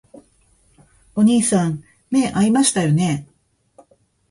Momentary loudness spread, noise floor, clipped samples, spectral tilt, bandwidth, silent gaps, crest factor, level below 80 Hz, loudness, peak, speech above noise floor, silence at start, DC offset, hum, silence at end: 11 LU; -58 dBFS; under 0.1%; -5 dB/octave; 11.5 kHz; none; 18 dB; -54 dBFS; -18 LUFS; -2 dBFS; 41 dB; 1.15 s; under 0.1%; none; 1.05 s